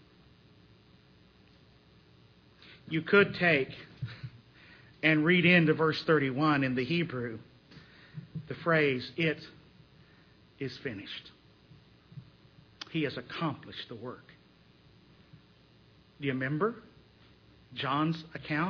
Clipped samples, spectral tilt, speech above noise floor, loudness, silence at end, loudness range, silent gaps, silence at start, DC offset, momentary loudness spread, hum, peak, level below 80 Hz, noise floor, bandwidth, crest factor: under 0.1%; -7.5 dB/octave; 31 dB; -29 LUFS; 0 s; 14 LU; none; 2.7 s; under 0.1%; 23 LU; none; -10 dBFS; -68 dBFS; -61 dBFS; 5.4 kHz; 22 dB